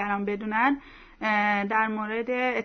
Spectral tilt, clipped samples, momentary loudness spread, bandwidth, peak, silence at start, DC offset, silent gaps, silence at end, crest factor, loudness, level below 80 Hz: -6.5 dB/octave; under 0.1%; 6 LU; 6.4 kHz; -10 dBFS; 0 s; under 0.1%; none; 0 s; 16 dB; -26 LUFS; -58 dBFS